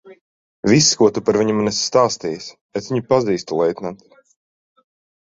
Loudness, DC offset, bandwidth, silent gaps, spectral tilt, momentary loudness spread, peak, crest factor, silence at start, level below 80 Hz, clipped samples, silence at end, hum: -18 LUFS; under 0.1%; 8 kHz; 0.21-0.63 s, 2.61-2.69 s; -4 dB/octave; 15 LU; -2 dBFS; 18 dB; 0.05 s; -56 dBFS; under 0.1%; 1.3 s; none